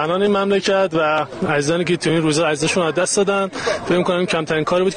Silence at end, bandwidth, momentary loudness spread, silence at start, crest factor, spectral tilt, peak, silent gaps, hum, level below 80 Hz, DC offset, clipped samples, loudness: 0 s; 10 kHz; 3 LU; 0 s; 12 dB; -4.5 dB/octave; -6 dBFS; none; none; -52 dBFS; under 0.1%; under 0.1%; -18 LUFS